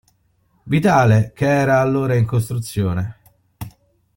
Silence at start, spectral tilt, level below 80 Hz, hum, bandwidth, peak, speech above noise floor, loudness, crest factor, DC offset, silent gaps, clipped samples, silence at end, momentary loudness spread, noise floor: 0.65 s; -7 dB/octave; -48 dBFS; none; 17 kHz; -2 dBFS; 45 dB; -17 LUFS; 16 dB; under 0.1%; none; under 0.1%; 0.5 s; 22 LU; -61 dBFS